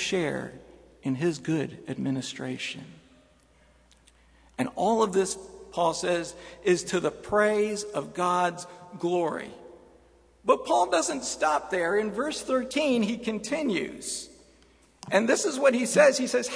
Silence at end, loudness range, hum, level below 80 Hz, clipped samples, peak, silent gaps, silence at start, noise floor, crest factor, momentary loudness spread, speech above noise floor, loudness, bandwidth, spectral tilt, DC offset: 0 s; 7 LU; none; -62 dBFS; under 0.1%; -6 dBFS; none; 0 s; -60 dBFS; 22 dB; 12 LU; 34 dB; -27 LUFS; 11 kHz; -4 dB/octave; under 0.1%